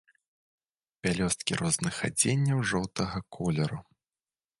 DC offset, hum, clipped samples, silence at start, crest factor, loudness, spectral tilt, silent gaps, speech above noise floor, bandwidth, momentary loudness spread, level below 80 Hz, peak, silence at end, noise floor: under 0.1%; none; under 0.1%; 1.05 s; 22 dB; -29 LUFS; -4 dB/octave; none; over 61 dB; 11.5 kHz; 8 LU; -54 dBFS; -10 dBFS; 0.8 s; under -90 dBFS